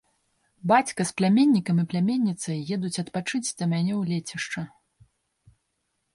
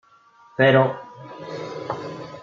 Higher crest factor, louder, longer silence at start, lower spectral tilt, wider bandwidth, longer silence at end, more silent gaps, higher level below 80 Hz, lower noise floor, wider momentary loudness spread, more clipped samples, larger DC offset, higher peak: about the same, 18 dB vs 20 dB; second, -25 LUFS vs -21 LUFS; about the same, 0.65 s vs 0.6 s; second, -5.5 dB/octave vs -7 dB/octave; first, 11.5 kHz vs 7.2 kHz; first, 1.45 s vs 0 s; neither; about the same, -68 dBFS vs -68 dBFS; first, -76 dBFS vs -54 dBFS; second, 11 LU vs 21 LU; neither; neither; second, -8 dBFS vs -4 dBFS